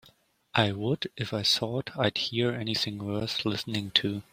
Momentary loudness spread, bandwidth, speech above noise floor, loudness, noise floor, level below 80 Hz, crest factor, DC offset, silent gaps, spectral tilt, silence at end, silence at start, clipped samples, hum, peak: 7 LU; 16 kHz; 33 dB; -28 LUFS; -62 dBFS; -62 dBFS; 26 dB; under 0.1%; none; -4.5 dB/octave; 0.1 s; 0.55 s; under 0.1%; none; -4 dBFS